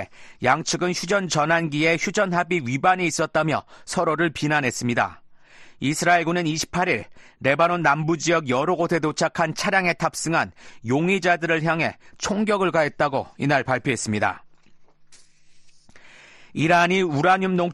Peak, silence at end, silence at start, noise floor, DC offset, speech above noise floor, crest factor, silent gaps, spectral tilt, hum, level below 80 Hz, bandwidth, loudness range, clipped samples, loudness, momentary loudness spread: -4 dBFS; 0 s; 0 s; -49 dBFS; under 0.1%; 28 dB; 18 dB; none; -4.5 dB/octave; none; -56 dBFS; 12.5 kHz; 4 LU; under 0.1%; -22 LUFS; 7 LU